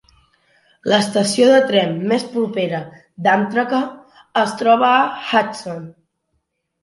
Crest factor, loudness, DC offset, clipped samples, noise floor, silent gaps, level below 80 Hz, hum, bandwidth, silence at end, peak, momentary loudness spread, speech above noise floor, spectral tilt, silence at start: 18 dB; -17 LUFS; under 0.1%; under 0.1%; -71 dBFS; none; -64 dBFS; none; 11.5 kHz; 0.9 s; 0 dBFS; 15 LU; 54 dB; -4.5 dB/octave; 0.85 s